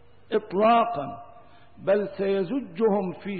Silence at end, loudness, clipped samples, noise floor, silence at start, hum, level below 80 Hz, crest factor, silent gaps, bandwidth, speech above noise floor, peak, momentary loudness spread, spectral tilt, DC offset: 0 s; -25 LUFS; under 0.1%; -52 dBFS; 0.3 s; none; -64 dBFS; 14 dB; none; 4.7 kHz; 28 dB; -12 dBFS; 13 LU; -10.5 dB/octave; 0.3%